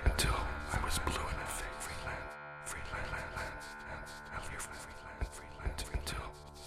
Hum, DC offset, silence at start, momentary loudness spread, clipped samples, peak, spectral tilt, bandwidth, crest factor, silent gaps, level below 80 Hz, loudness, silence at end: none; under 0.1%; 0 s; 10 LU; under 0.1%; -18 dBFS; -3.5 dB/octave; 15.5 kHz; 22 dB; none; -44 dBFS; -40 LUFS; 0 s